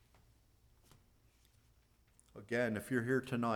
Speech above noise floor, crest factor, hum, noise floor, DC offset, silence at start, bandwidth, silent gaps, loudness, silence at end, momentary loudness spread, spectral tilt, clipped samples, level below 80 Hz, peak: 34 dB; 20 dB; none; -70 dBFS; under 0.1%; 2.35 s; 18 kHz; none; -37 LUFS; 0 s; 21 LU; -6.5 dB/octave; under 0.1%; -70 dBFS; -22 dBFS